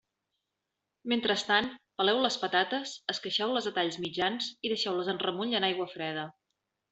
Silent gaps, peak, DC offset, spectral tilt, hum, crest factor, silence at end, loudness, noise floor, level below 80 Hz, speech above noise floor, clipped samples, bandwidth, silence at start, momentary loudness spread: none; -10 dBFS; under 0.1%; -3.5 dB/octave; none; 22 dB; 0.6 s; -30 LUFS; -86 dBFS; -74 dBFS; 55 dB; under 0.1%; 8.2 kHz; 1.05 s; 8 LU